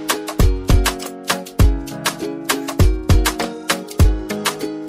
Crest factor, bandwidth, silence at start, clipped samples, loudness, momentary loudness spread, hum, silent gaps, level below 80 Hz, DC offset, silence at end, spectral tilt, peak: 14 dB; 16 kHz; 0 s; under 0.1%; -19 LUFS; 6 LU; none; none; -20 dBFS; under 0.1%; 0 s; -4.5 dB/octave; -2 dBFS